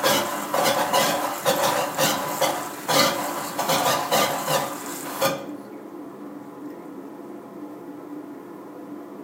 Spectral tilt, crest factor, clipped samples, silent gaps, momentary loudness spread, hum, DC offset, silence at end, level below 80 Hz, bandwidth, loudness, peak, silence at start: -2.5 dB/octave; 20 dB; under 0.1%; none; 18 LU; none; under 0.1%; 0 s; -70 dBFS; 16 kHz; -23 LUFS; -6 dBFS; 0 s